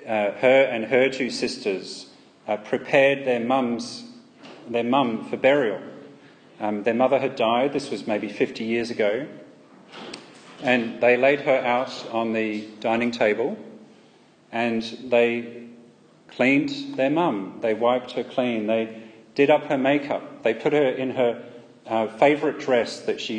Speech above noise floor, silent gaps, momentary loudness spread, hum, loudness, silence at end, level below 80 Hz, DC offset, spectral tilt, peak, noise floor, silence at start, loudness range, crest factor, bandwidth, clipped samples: 32 dB; none; 14 LU; none; -23 LUFS; 0 s; -72 dBFS; under 0.1%; -5.5 dB/octave; -6 dBFS; -54 dBFS; 0 s; 3 LU; 18 dB; 9.6 kHz; under 0.1%